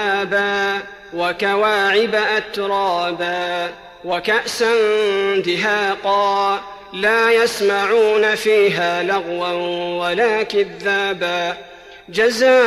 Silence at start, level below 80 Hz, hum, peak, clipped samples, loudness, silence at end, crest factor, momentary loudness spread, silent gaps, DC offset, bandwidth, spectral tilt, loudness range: 0 s; -58 dBFS; none; -6 dBFS; under 0.1%; -17 LUFS; 0 s; 12 dB; 8 LU; none; under 0.1%; 14 kHz; -3.5 dB/octave; 3 LU